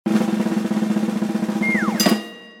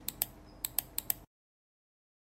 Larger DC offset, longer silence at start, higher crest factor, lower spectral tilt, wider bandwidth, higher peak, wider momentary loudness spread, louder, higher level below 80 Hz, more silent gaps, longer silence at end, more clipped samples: neither; about the same, 0.05 s vs 0 s; second, 18 dB vs 32 dB; first, -4.5 dB/octave vs -1 dB/octave; about the same, 17.5 kHz vs 16.5 kHz; first, -2 dBFS vs -8 dBFS; first, 5 LU vs 2 LU; first, -20 LUFS vs -36 LUFS; about the same, -64 dBFS vs -60 dBFS; neither; second, 0 s vs 1 s; neither